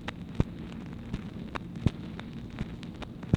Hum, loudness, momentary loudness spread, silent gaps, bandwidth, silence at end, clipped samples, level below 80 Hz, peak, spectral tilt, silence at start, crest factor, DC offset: none; -37 LUFS; 9 LU; none; 11.5 kHz; 0 s; under 0.1%; -44 dBFS; -8 dBFS; -7.5 dB/octave; 0 s; 26 dB; under 0.1%